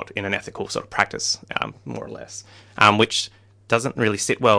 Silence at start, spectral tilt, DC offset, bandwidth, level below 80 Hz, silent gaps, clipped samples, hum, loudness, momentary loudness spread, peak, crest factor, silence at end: 0 s; -3.5 dB/octave; under 0.1%; 10.5 kHz; -58 dBFS; none; under 0.1%; none; -21 LUFS; 18 LU; 0 dBFS; 22 dB; 0 s